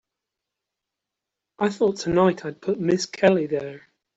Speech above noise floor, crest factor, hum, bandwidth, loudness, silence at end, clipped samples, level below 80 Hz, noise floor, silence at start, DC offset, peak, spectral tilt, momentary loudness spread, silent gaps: 63 dB; 20 dB; none; 8 kHz; -23 LUFS; 0.4 s; under 0.1%; -58 dBFS; -85 dBFS; 1.6 s; under 0.1%; -4 dBFS; -5.5 dB/octave; 9 LU; none